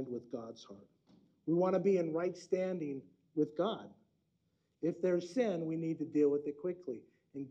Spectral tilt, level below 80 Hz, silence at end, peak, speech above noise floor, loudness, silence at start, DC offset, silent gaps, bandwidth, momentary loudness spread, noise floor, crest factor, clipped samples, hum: -7.5 dB/octave; -84 dBFS; 0 s; -20 dBFS; 44 dB; -36 LUFS; 0 s; under 0.1%; none; 8.8 kHz; 16 LU; -79 dBFS; 16 dB; under 0.1%; none